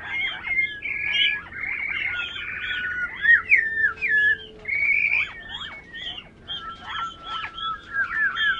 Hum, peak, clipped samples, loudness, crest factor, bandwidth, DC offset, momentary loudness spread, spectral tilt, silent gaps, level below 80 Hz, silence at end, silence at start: none; -6 dBFS; under 0.1%; -22 LUFS; 20 dB; 9.2 kHz; under 0.1%; 15 LU; -2 dB/octave; none; -54 dBFS; 0 s; 0 s